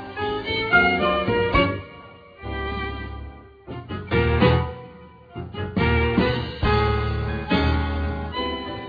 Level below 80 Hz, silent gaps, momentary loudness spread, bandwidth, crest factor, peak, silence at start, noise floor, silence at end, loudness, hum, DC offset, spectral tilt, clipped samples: -32 dBFS; none; 20 LU; 5 kHz; 18 dB; -4 dBFS; 0 s; -44 dBFS; 0 s; -22 LUFS; none; under 0.1%; -8.5 dB/octave; under 0.1%